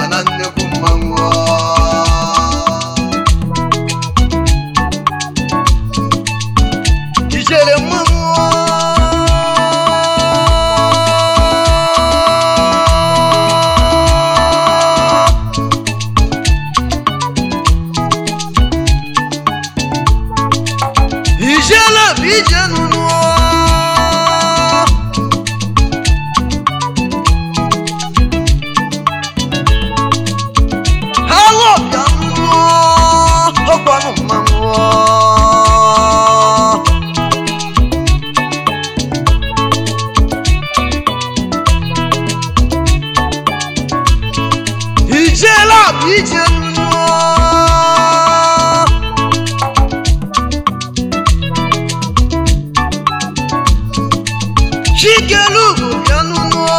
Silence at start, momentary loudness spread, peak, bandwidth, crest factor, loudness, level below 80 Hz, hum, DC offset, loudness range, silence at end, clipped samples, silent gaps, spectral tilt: 0 s; 8 LU; 0 dBFS; 16.5 kHz; 10 dB; -11 LUFS; -18 dBFS; none; 1%; 5 LU; 0 s; 0.4%; none; -4 dB/octave